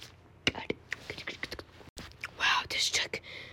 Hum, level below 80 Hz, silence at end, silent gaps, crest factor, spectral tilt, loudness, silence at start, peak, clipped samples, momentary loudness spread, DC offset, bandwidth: none; -60 dBFS; 0 s; 1.89-1.96 s; 26 dB; -1 dB/octave; -32 LUFS; 0 s; -8 dBFS; under 0.1%; 20 LU; under 0.1%; 16.5 kHz